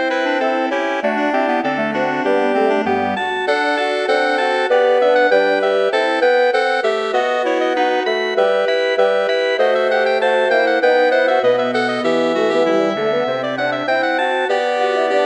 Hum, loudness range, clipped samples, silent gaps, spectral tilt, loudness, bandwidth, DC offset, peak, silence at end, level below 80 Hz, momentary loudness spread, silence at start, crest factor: none; 2 LU; under 0.1%; none; -4 dB/octave; -16 LUFS; 9.4 kHz; under 0.1%; -2 dBFS; 0 s; -66 dBFS; 4 LU; 0 s; 14 dB